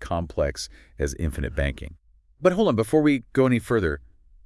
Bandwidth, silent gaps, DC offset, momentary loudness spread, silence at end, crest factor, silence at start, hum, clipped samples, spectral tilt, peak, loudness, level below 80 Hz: 12 kHz; none; under 0.1%; 15 LU; 0.45 s; 18 dB; 0 s; none; under 0.1%; -6.5 dB/octave; -6 dBFS; -24 LUFS; -38 dBFS